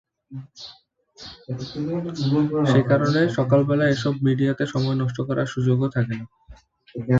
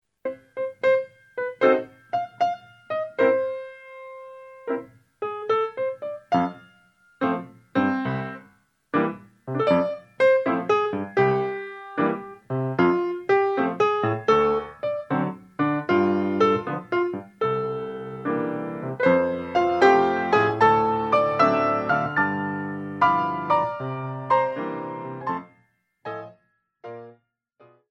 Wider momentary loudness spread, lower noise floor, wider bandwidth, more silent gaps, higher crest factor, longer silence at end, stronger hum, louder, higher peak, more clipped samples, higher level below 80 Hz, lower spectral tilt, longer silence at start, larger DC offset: first, 21 LU vs 15 LU; second, -49 dBFS vs -65 dBFS; second, 7.6 kHz vs 8.4 kHz; neither; about the same, 16 dB vs 18 dB; second, 0 s vs 0.8 s; neither; about the same, -22 LUFS vs -24 LUFS; about the same, -6 dBFS vs -6 dBFS; neither; first, -54 dBFS vs -62 dBFS; about the same, -7.5 dB/octave vs -7.5 dB/octave; about the same, 0.3 s vs 0.25 s; neither